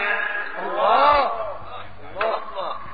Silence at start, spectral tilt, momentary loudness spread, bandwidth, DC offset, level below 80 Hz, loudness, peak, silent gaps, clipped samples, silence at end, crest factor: 0 s; 0 dB/octave; 20 LU; 5 kHz; 2%; -50 dBFS; -21 LUFS; -4 dBFS; none; under 0.1%; 0 s; 18 dB